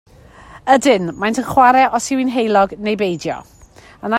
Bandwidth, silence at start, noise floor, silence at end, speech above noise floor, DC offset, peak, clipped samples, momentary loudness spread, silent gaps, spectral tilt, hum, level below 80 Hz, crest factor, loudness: 16 kHz; 0.5 s; -41 dBFS; 0 s; 26 dB; under 0.1%; 0 dBFS; under 0.1%; 14 LU; none; -4.5 dB/octave; none; -48 dBFS; 16 dB; -15 LUFS